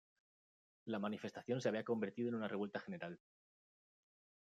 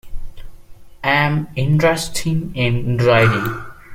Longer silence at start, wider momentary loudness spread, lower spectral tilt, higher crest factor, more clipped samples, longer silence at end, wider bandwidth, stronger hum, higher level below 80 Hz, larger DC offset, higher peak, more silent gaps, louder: first, 0.85 s vs 0.05 s; about the same, 10 LU vs 9 LU; about the same, -6.5 dB/octave vs -5.5 dB/octave; about the same, 20 dB vs 16 dB; neither; first, 1.3 s vs 0 s; second, 9 kHz vs 16.5 kHz; neither; second, -90 dBFS vs -36 dBFS; neither; second, -24 dBFS vs -2 dBFS; neither; second, -43 LUFS vs -17 LUFS